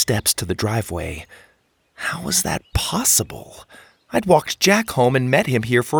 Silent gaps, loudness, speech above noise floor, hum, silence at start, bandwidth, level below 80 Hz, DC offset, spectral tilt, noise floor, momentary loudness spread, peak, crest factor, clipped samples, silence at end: none; -19 LUFS; 41 dB; none; 0 s; over 20 kHz; -42 dBFS; under 0.1%; -3.5 dB/octave; -60 dBFS; 12 LU; -2 dBFS; 20 dB; under 0.1%; 0 s